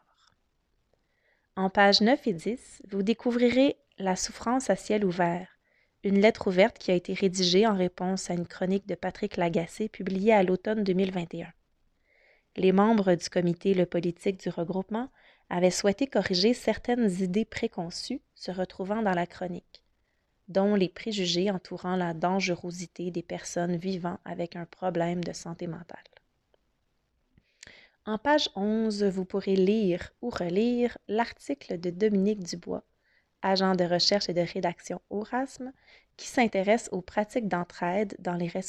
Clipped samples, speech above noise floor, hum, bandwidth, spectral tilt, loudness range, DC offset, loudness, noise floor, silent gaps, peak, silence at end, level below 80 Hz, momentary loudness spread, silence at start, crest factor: under 0.1%; 47 dB; none; 11.5 kHz; -5 dB/octave; 7 LU; under 0.1%; -28 LUFS; -74 dBFS; none; -8 dBFS; 0 s; -60 dBFS; 13 LU; 1.55 s; 20 dB